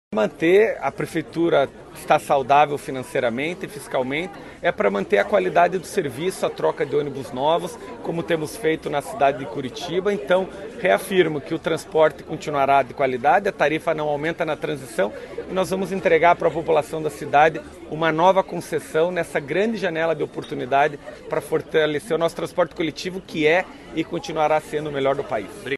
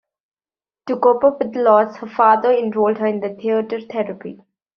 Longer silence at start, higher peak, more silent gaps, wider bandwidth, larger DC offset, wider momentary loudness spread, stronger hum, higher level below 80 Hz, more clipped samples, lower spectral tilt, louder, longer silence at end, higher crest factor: second, 0.1 s vs 0.85 s; about the same, -2 dBFS vs -2 dBFS; neither; first, 13 kHz vs 6 kHz; neither; about the same, 11 LU vs 12 LU; neither; first, -54 dBFS vs -66 dBFS; neither; about the same, -5 dB/octave vs -5 dB/octave; second, -22 LUFS vs -17 LUFS; second, 0 s vs 0.4 s; about the same, 20 dB vs 16 dB